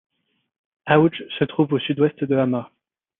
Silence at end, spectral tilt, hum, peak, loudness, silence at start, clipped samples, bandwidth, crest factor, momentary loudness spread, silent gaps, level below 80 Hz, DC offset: 0.55 s; -10.5 dB/octave; none; -2 dBFS; -21 LUFS; 0.85 s; under 0.1%; 4 kHz; 20 dB; 8 LU; none; -64 dBFS; under 0.1%